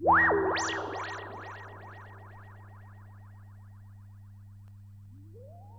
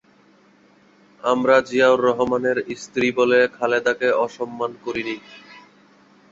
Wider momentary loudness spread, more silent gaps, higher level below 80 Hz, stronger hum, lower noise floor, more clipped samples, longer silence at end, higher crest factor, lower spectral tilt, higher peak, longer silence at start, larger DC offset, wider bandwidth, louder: first, 25 LU vs 11 LU; neither; about the same, -58 dBFS vs -60 dBFS; neither; second, -50 dBFS vs -55 dBFS; neither; second, 0 s vs 0.7 s; about the same, 20 dB vs 20 dB; about the same, -4 dB/octave vs -4.5 dB/octave; second, -14 dBFS vs -2 dBFS; second, 0 s vs 1.25 s; neither; first, 8.8 kHz vs 7.8 kHz; second, -29 LUFS vs -20 LUFS